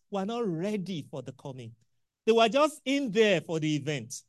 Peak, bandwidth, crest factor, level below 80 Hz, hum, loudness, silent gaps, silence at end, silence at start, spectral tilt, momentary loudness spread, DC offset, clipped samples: -10 dBFS; 12.5 kHz; 18 dB; -76 dBFS; none; -28 LUFS; none; 0.1 s; 0.1 s; -5 dB/octave; 18 LU; under 0.1%; under 0.1%